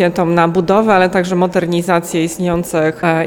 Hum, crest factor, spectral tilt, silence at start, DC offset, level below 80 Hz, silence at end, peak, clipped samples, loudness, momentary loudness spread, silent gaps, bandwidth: none; 12 dB; -6 dB/octave; 0 s; under 0.1%; -44 dBFS; 0 s; -2 dBFS; under 0.1%; -14 LUFS; 5 LU; none; 18 kHz